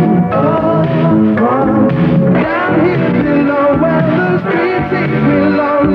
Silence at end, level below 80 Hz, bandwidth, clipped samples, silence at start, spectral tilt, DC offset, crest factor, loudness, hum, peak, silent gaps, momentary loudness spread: 0 s; -38 dBFS; 5.6 kHz; under 0.1%; 0 s; -10 dB/octave; under 0.1%; 10 dB; -12 LUFS; none; 0 dBFS; none; 2 LU